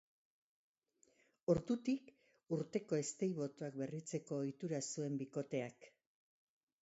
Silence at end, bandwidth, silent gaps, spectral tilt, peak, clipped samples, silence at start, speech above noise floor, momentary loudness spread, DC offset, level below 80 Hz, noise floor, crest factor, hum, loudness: 0.95 s; 8 kHz; none; -7.5 dB/octave; -20 dBFS; under 0.1%; 1.5 s; 36 dB; 7 LU; under 0.1%; -74 dBFS; -77 dBFS; 22 dB; none; -42 LUFS